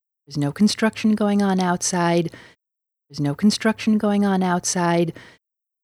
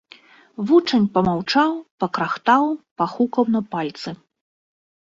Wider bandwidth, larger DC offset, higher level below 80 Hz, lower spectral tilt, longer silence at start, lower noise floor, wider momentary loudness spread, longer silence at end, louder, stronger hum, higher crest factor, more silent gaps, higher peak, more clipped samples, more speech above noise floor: first, 13.5 kHz vs 7.6 kHz; neither; about the same, -60 dBFS vs -60 dBFS; second, -5 dB/octave vs -6.5 dB/octave; second, 0.3 s vs 0.6 s; first, -84 dBFS vs -49 dBFS; second, 8 LU vs 13 LU; second, 0.6 s vs 0.9 s; about the same, -20 LUFS vs -20 LUFS; neither; about the same, 14 dB vs 18 dB; second, none vs 1.91-1.98 s, 2.91-2.96 s; second, -8 dBFS vs -4 dBFS; neither; first, 64 dB vs 29 dB